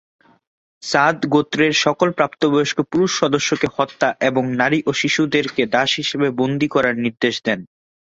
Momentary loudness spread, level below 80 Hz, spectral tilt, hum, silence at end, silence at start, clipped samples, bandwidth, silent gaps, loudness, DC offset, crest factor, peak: 4 LU; -58 dBFS; -4.5 dB/octave; none; 0.5 s; 0.85 s; under 0.1%; 8 kHz; none; -18 LUFS; under 0.1%; 16 dB; -2 dBFS